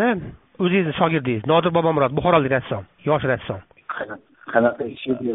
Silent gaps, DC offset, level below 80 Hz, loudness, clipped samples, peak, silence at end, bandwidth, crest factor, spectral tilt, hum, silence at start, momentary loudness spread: none; under 0.1%; -50 dBFS; -21 LUFS; under 0.1%; -2 dBFS; 0 s; 4 kHz; 20 dB; -5 dB/octave; none; 0 s; 15 LU